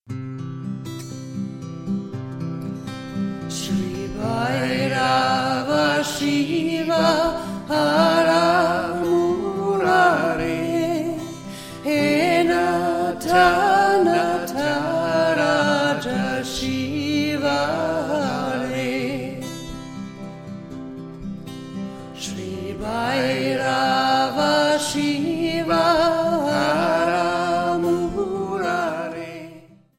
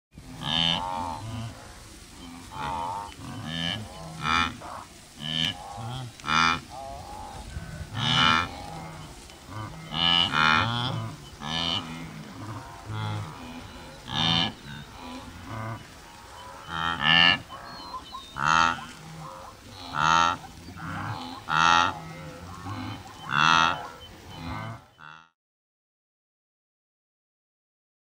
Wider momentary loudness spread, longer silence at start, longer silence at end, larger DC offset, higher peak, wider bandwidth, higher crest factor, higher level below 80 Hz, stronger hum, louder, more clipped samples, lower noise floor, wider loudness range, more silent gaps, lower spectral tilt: second, 16 LU vs 23 LU; about the same, 0.1 s vs 0.15 s; second, 0.35 s vs 2.9 s; neither; about the same, -4 dBFS vs -6 dBFS; about the same, 16.5 kHz vs 16 kHz; second, 18 dB vs 24 dB; about the same, -50 dBFS vs -52 dBFS; neither; first, -21 LUFS vs -25 LUFS; neither; about the same, -46 dBFS vs -49 dBFS; first, 10 LU vs 7 LU; neither; first, -5 dB/octave vs -3 dB/octave